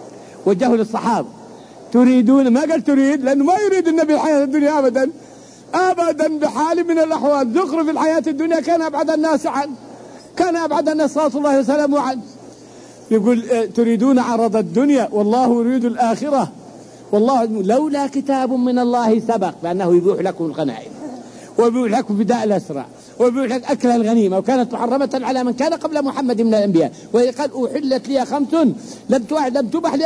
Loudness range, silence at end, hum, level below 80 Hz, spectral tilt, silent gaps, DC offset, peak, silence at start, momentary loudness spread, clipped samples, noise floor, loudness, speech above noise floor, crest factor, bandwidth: 3 LU; 0 s; none; -62 dBFS; -6 dB/octave; none; under 0.1%; -4 dBFS; 0 s; 7 LU; under 0.1%; -40 dBFS; -17 LUFS; 24 dB; 12 dB; 10.5 kHz